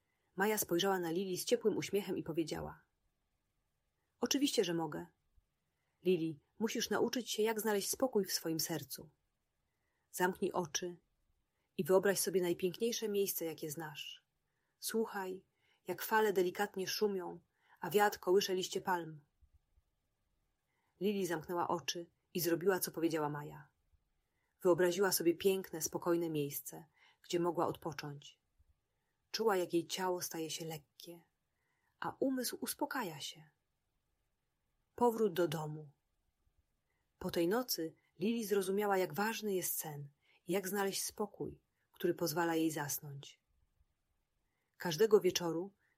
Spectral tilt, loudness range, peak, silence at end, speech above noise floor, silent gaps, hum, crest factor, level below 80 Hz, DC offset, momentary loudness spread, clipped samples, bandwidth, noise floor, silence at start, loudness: -4 dB/octave; 5 LU; -18 dBFS; 0.3 s; 49 dB; none; none; 20 dB; -76 dBFS; under 0.1%; 15 LU; under 0.1%; 16 kHz; -85 dBFS; 0.35 s; -37 LUFS